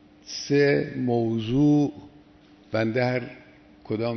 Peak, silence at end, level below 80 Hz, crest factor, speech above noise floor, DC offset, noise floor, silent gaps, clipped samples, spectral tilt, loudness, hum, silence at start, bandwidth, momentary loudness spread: -10 dBFS; 0 s; -56 dBFS; 16 dB; 30 dB; under 0.1%; -53 dBFS; none; under 0.1%; -6.5 dB/octave; -24 LUFS; none; 0.25 s; 6.4 kHz; 12 LU